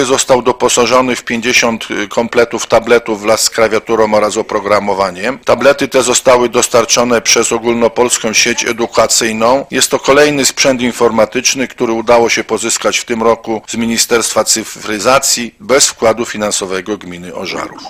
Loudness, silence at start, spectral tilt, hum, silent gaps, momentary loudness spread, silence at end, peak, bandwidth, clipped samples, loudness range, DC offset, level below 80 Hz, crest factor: -11 LUFS; 0 s; -2 dB/octave; none; none; 7 LU; 0 s; 0 dBFS; 18.5 kHz; 0.3%; 2 LU; under 0.1%; -44 dBFS; 12 dB